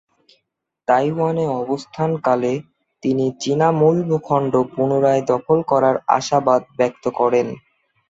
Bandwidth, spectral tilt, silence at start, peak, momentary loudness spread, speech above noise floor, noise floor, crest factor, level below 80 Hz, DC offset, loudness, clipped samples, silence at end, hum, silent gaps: 8 kHz; -6.5 dB/octave; 0.9 s; -2 dBFS; 7 LU; 57 dB; -74 dBFS; 18 dB; -60 dBFS; under 0.1%; -19 LUFS; under 0.1%; 0.5 s; none; none